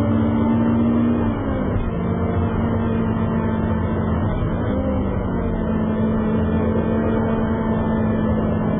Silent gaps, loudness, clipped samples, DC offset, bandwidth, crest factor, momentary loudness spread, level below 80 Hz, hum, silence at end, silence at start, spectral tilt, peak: none; -20 LUFS; under 0.1%; under 0.1%; 3.7 kHz; 12 dB; 4 LU; -30 dBFS; none; 0 s; 0 s; -8.5 dB/octave; -8 dBFS